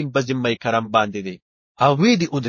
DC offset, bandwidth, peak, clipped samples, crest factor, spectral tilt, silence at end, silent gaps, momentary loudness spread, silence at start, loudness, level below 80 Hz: under 0.1%; 7.4 kHz; -2 dBFS; under 0.1%; 18 dB; -5.5 dB/octave; 0 s; 1.42-1.75 s; 10 LU; 0 s; -19 LUFS; -58 dBFS